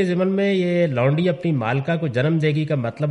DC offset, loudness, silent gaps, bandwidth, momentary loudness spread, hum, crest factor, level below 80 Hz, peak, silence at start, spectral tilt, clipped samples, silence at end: under 0.1%; -20 LUFS; none; 10 kHz; 3 LU; none; 12 dB; -60 dBFS; -8 dBFS; 0 s; -8.5 dB/octave; under 0.1%; 0 s